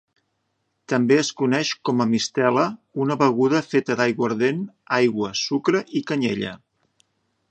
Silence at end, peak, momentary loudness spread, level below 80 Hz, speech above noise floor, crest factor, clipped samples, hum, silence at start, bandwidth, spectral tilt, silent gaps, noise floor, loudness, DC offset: 0.95 s; -2 dBFS; 6 LU; -66 dBFS; 52 dB; 20 dB; under 0.1%; none; 0.9 s; 8.8 kHz; -5 dB/octave; none; -73 dBFS; -22 LUFS; under 0.1%